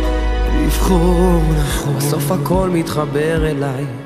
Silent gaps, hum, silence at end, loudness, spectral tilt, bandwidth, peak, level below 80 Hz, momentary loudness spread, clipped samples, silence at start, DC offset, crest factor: none; none; 0 s; -17 LUFS; -6 dB/octave; 15.5 kHz; -2 dBFS; -20 dBFS; 5 LU; under 0.1%; 0 s; under 0.1%; 12 dB